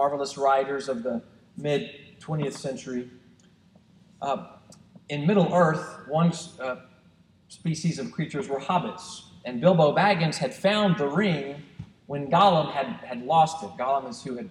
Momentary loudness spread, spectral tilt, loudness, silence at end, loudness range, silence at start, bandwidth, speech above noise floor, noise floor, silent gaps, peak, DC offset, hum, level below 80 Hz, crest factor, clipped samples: 15 LU; -6 dB/octave; -26 LUFS; 0 s; 9 LU; 0 s; 11 kHz; 33 dB; -59 dBFS; none; -6 dBFS; under 0.1%; none; -66 dBFS; 20 dB; under 0.1%